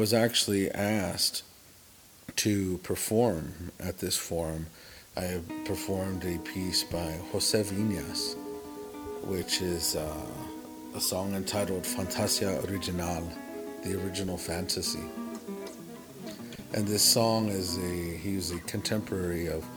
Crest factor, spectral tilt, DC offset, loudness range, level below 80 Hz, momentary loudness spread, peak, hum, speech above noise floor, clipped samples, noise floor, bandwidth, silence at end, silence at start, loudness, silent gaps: 24 dB; -3.5 dB/octave; under 0.1%; 5 LU; -56 dBFS; 14 LU; -8 dBFS; none; 24 dB; under 0.1%; -55 dBFS; over 20 kHz; 0 s; 0 s; -30 LUFS; none